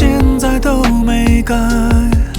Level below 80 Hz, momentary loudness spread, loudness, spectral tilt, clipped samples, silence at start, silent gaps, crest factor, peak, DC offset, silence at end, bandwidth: -14 dBFS; 2 LU; -13 LUFS; -6 dB/octave; under 0.1%; 0 s; none; 10 dB; 0 dBFS; under 0.1%; 0 s; 18 kHz